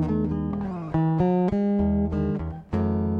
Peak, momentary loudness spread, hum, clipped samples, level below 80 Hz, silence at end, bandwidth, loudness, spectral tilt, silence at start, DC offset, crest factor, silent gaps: -12 dBFS; 7 LU; none; under 0.1%; -38 dBFS; 0 s; 5 kHz; -25 LUFS; -11 dB/octave; 0 s; under 0.1%; 12 dB; none